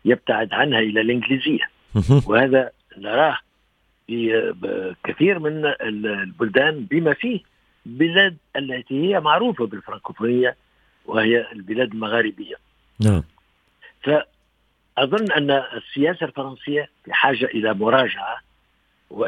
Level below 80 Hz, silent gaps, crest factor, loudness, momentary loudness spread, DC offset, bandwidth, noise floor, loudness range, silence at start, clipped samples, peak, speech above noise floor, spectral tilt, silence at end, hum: -48 dBFS; none; 22 dB; -20 LUFS; 12 LU; under 0.1%; 11.5 kHz; -65 dBFS; 3 LU; 0.05 s; under 0.1%; 0 dBFS; 45 dB; -7 dB/octave; 0 s; none